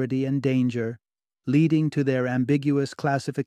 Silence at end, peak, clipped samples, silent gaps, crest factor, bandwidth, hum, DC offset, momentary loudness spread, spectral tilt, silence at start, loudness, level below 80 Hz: 0.05 s; -10 dBFS; under 0.1%; none; 14 dB; 11 kHz; none; under 0.1%; 9 LU; -8 dB/octave; 0 s; -24 LUFS; -66 dBFS